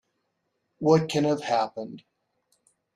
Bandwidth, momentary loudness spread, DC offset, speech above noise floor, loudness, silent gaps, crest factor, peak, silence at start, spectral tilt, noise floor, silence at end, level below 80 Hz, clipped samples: 12.5 kHz; 15 LU; under 0.1%; 53 dB; -25 LUFS; none; 22 dB; -6 dBFS; 0.8 s; -6 dB/octave; -77 dBFS; 1 s; -68 dBFS; under 0.1%